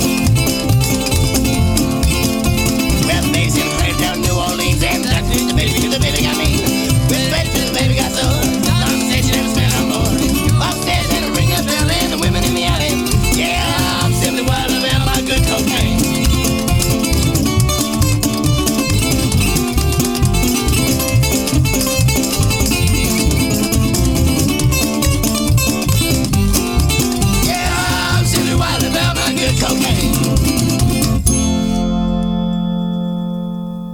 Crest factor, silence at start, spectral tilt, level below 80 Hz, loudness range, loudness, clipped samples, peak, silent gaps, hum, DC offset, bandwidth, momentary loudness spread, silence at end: 14 dB; 0 s; -4.5 dB/octave; -24 dBFS; 1 LU; -15 LUFS; under 0.1%; 0 dBFS; none; none; under 0.1%; 18 kHz; 2 LU; 0 s